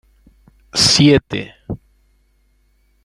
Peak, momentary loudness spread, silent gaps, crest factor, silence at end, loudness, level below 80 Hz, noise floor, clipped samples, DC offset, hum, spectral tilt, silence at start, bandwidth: 0 dBFS; 21 LU; none; 18 dB; 1.3 s; -13 LUFS; -44 dBFS; -58 dBFS; under 0.1%; under 0.1%; none; -4 dB/octave; 0.75 s; 15.5 kHz